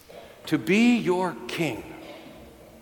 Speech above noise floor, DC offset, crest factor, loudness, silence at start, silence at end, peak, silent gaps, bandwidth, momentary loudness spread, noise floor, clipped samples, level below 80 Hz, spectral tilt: 24 dB; under 0.1%; 16 dB; -24 LUFS; 0.1 s; 0.05 s; -10 dBFS; none; 18 kHz; 24 LU; -47 dBFS; under 0.1%; -60 dBFS; -5.5 dB/octave